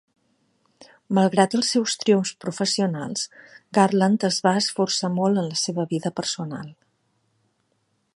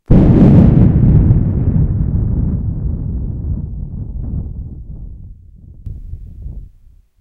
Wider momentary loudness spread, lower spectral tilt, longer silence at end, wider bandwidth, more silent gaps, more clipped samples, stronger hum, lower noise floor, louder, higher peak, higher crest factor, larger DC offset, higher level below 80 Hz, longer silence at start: second, 10 LU vs 24 LU; second, -4.5 dB/octave vs -12 dB/octave; first, 1.4 s vs 0.55 s; first, 11.5 kHz vs 4 kHz; neither; second, under 0.1% vs 0.2%; neither; first, -70 dBFS vs -45 dBFS; second, -22 LUFS vs -13 LUFS; about the same, -2 dBFS vs 0 dBFS; first, 22 dB vs 14 dB; neither; second, -72 dBFS vs -20 dBFS; first, 0.8 s vs 0.1 s